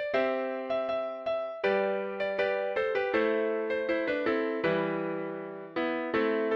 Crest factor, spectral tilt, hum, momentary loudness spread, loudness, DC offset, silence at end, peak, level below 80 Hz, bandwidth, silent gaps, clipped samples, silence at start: 16 dB; -7 dB/octave; none; 5 LU; -30 LUFS; under 0.1%; 0 s; -14 dBFS; -68 dBFS; 6.6 kHz; none; under 0.1%; 0 s